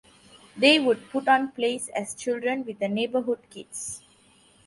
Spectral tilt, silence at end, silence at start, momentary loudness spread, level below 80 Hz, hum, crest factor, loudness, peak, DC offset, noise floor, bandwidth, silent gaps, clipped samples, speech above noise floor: -3 dB/octave; 0.7 s; 0.55 s; 15 LU; -70 dBFS; none; 22 dB; -25 LUFS; -4 dBFS; under 0.1%; -58 dBFS; 11.5 kHz; none; under 0.1%; 33 dB